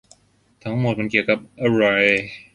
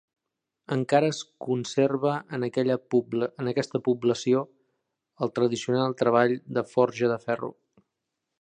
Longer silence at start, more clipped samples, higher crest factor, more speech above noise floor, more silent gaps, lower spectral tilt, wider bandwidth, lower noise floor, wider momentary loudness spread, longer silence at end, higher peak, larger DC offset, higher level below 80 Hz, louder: about the same, 0.65 s vs 0.7 s; neither; about the same, 20 dB vs 20 dB; second, 39 dB vs 59 dB; neither; about the same, -6.5 dB/octave vs -6 dB/octave; first, 11 kHz vs 9.8 kHz; second, -58 dBFS vs -84 dBFS; about the same, 9 LU vs 8 LU; second, 0.15 s vs 0.9 s; first, -2 dBFS vs -6 dBFS; neither; first, -56 dBFS vs -72 dBFS; first, -19 LUFS vs -26 LUFS